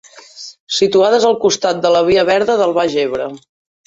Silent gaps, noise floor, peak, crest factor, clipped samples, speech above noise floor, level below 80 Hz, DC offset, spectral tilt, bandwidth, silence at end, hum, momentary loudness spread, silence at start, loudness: 0.60-0.67 s; -36 dBFS; -2 dBFS; 14 dB; under 0.1%; 23 dB; -52 dBFS; under 0.1%; -3.5 dB/octave; 8 kHz; 0.5 s; none; 15 LU; 0.15 s; -14 LUFS